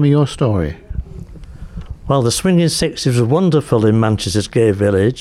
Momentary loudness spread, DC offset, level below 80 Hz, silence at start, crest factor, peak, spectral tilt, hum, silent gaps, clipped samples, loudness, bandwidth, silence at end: 19 LU; under 0.1%; -34 dBFS; 0 s; 14 dB; -2 dBFS; -6 dB/octave; none; none; under 0.1%; -15 LUFS; 14.5 kHz; 0 s